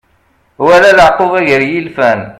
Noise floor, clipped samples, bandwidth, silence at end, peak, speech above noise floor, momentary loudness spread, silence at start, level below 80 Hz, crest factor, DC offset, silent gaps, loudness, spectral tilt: -53 dBFS; 1%; 15.5 kHz; 0.05 s; 0 dBFS; 45 dB; 8 LU; 0.6 s; -40 dBFS; 10 dB; under 0.1%; none; -8 LUFS; -5 dB/octave